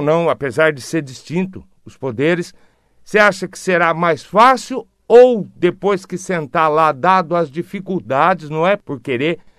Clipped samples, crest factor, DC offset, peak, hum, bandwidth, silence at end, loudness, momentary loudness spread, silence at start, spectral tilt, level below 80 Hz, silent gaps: 0.1%; 16 dB; under 0.1%; 0 dBFS; none; 13 kHz; 0.2 s; -16 LUFS; 12 LU; 0 s; -5.5 dB/octave; -56 dBFS; none